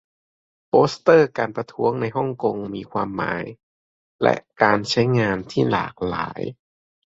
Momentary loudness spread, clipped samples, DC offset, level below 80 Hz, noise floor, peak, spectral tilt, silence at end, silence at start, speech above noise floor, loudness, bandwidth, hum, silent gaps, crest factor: 12 LU; under 0.1%; under 0.1%; -54 dBFS; under -90 dBFS; 0 dBFS; -6 dB/octave; 0.65 s; 0.75 s; over 69 dB; -21 LUFS; 7.8 kHz; none; 3.63-4.19 s; 20 dB